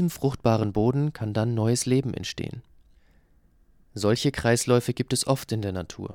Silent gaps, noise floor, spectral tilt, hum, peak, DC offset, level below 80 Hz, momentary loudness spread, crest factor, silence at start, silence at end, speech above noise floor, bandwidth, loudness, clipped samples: none; -60 dBFS; -5.5 dB/octave; none; -8 dBFS; under 0.1%; -50 dBFS; 10 LU; 18 dB; 0 s; 0 s; 35 dB; 17.5 kHz; -25 LUFS; under 0.1%